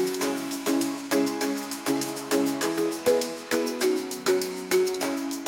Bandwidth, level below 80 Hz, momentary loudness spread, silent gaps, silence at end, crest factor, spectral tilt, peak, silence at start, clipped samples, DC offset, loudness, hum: 17 kHz; -70 dBFS; 4 LU; none; 0 s; 16 dB; -3 dB/octave; -10 dBFS; 0 s; under 0.1%; under 0.1%; -27 LUFS; none